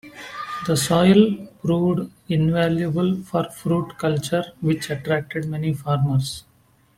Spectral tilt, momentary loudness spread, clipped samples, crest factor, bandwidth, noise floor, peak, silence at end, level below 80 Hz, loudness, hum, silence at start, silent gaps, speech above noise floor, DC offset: -6 dB/octave; 11 LU; under 0.1%; 18 dB; 16 kHz; -58 dBFS; -2 dBFS; 0.55 s; -52 dBFS; -22 LUFS; none; 0.05 s; none; 37 dB; under 0.1%